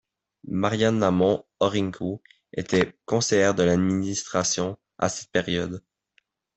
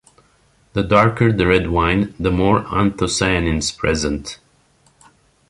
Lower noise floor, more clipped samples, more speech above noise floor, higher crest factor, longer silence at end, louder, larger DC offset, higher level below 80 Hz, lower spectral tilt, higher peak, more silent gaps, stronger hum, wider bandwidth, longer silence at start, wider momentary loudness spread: first, -68 dBFS vs -57 dBFS; neither; first, 44 dB vs 40 dB; about the same, 18 dB vs 18 dB; second, 0.75 s vs 1.15 s; second, -24 LUFS vs -17 LUFS; neither; second, -58 dBFS vs -34 dBFS; about the same, -4.5 dB/octave vs -5 dB/octave; second, -6 dBFS vs -2 dBFS; neither; neither; second, 8.4 kHz vs 11.5 kHz; second, 0.45 s vs 0.75 s; about the same, 12 LU vs 10 LU